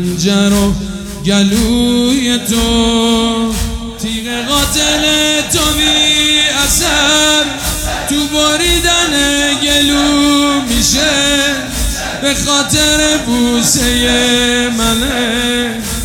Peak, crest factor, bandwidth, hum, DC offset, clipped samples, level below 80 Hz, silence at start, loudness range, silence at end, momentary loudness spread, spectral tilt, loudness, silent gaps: 0 dBFS; 12 dB; 19 kHz; none; under 0.1%; under 0.1%; -26 dBFS; 0 s; 3 LU; 0 s; 8 LU; -2.5 dB/octave; -11 LUFS; none